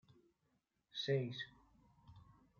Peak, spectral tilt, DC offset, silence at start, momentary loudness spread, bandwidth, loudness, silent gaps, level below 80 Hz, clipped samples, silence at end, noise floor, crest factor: -26 dBFS; -4.5 dB/octave; under 0.1%; 0.95 s; 14 LU; 7 kHz; -43 LUFS; none; -78 dBFS; under 0.1%; 0.35 s; -83 dBFS; 20 dB